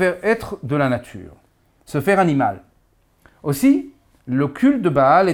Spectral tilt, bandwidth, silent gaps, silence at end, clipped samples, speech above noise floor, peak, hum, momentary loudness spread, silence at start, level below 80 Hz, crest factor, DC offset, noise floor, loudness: -7 dB/octave; 18.5 kHz; none; 0 s; under 0.1%; 42 dB; -2 dBFS; none; 15 LU; 0 s; -52 dBFS; 16 dB; under 0.1%; -59 dBFS; -19 LUFS